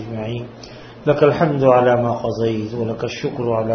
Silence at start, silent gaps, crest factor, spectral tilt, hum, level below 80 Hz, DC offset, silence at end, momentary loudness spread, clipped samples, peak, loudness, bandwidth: 0 s; none; 18 dB; -7.5 dB/octave; none; -50 dBFS; under 0.1%; 0 s; 15 LU; under 0.1%; 0 dBFS; -18 LUFS; 6.6 kHz